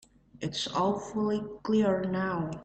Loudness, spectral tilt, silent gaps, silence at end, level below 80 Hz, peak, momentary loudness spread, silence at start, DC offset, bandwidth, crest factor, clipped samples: -30 LUFS; -5.5 dB/octave; none; 0 s; -60 dBFS; -16 dBFS; 7 LU; 0.35 s; under 0.1%; 8.8 kHz; 14 dB; under 0.1%